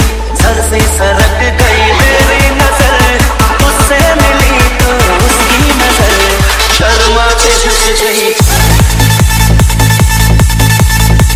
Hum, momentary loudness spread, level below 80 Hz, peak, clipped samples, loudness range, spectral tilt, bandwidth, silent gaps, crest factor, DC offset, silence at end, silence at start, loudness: none; 2 LU; -12 dBFS; 0 dBFS; 3%; 0 LU; -4 dB/octave; 18 kHz; none; 6 dB; under 0.1%; 0 s; 0 s; -7 LUFS